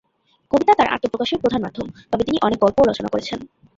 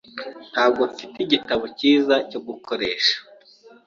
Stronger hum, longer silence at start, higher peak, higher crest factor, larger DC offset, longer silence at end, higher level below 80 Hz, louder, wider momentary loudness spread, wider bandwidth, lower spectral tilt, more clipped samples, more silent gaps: neither; first, 0.55 s vs 0.15 s; about the same, -2 dBFS vs -4 dBFS; about the same, 18 dB vs 20 dB; neither; second, 0.35 s vs 0.65 s; first, -48 dBFS vs -62 dBFS; about the same, -19 LUFS vs -21 LUFS; about the same, 13 LU vs 13 LU; about the same, 7.8 kHz vs 7.4 kHz; first, -5.5 dB/octave vs -3.5 dB/octave; neither; neither